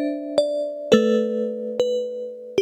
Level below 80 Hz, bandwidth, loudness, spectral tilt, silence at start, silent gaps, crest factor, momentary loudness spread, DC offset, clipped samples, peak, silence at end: -62 dBFS; 12.5 kHz; -22 LUFS; -5 dB/octave; 0 s; none; 20 dB; 9 LU; under 0.1%; under 0.1%; -2 dBFS; 0 s